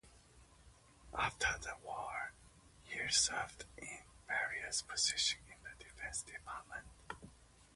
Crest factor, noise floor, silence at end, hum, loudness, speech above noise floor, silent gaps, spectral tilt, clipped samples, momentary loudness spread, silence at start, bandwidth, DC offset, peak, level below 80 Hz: 24 dB; -64 dBFS; 0.15 s; none; -39 LUFS; 24 dB; none; 0 dB/octave; under 0.1%; 19 LU; 0.05 s; 11.5 kHz; under 0.1%; -18 dBFS; -62 dBFS